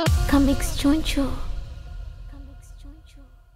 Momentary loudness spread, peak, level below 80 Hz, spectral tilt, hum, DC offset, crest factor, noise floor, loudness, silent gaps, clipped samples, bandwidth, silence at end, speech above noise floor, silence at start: 24 LU; -8 dBFS; -28 dBFS; -5.5 dB/octave; none; under 0.1%; 16 dB; -47 dBFS; -22 LUFS; none; under 0.1%; 16 kHz; 0.3 s; 27 dB; 0 s